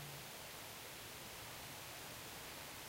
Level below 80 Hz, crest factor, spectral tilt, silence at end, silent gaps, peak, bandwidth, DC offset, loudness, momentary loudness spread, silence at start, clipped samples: -70 dBFS; 14 dB; -2 dB/octave; 0 s; none; -38 dBFS; 16 kHz; under 0.1%; -50 LUFS; 1 LU; 0 s; under 0.1%